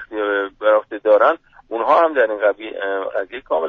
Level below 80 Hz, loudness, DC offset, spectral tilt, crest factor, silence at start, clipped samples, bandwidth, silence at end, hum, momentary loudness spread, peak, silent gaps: -60 dBFS; -18 LUFS; under 0.1%; -5 dB/octave; 16 dB; 0 s; under 0.1%; 4.7 kHz; 0 s; none; 11 LU; -2 dBFS; none